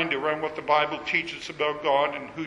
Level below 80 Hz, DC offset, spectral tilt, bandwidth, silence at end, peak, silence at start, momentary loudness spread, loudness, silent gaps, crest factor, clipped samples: -62 dBFS; under 0.1%; -4 dB/octave; 11.5 kHz; 0 s; -8 dBFS; 0 s; 5 LU; -26 LUFS; none; 20 dB; under 0.1%